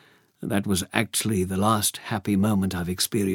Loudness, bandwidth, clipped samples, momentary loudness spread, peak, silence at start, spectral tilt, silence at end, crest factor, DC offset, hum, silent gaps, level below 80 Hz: -24 LUFS; 18 kHz; under 0.1%; 6 LU; -2 dBFS; 0.4 s; -4.5 dB/octave; 0 s; 24 dB; under 0.1%; none; none; -60 dBFS